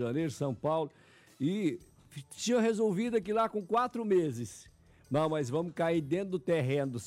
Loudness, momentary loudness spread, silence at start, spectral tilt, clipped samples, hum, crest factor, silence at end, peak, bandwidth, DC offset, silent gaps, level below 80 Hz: -32 LUFS; 12 LU; 0 s; -6 dB/octave; under 0.1%; none; 12 dB; 0 s; -20 dBFS; 15.5 kHz; under 0.1%; none; -68 dBFS